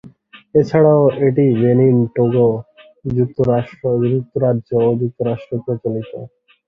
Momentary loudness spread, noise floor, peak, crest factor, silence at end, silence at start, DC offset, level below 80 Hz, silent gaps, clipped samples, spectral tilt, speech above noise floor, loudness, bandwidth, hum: 11 LU; -43 dBFS; -2 dBFS; 14 dB; 0.4 s; 0.05 s; under 0.1%; -50 dBFS; none; under 0.1%; -10.5 dB/octave; 28 dB; -16 LUFS; 6.2 kHz; none